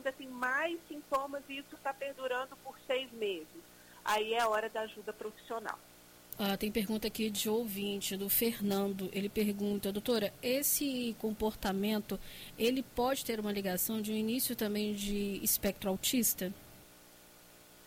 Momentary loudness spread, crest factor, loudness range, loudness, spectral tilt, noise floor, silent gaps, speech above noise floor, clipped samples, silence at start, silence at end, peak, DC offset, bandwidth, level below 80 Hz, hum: 12 LU; 16 dB; 4 LU; -35 LUFS; -3.5 dB/octave; -58 dBFS; none; 23 dB; under 0.1%; 0 s; 0 s; -18 dBFS; under 0.1%; 16.5 kHz; -60 dBFS; 60 Hz at -65 dBFS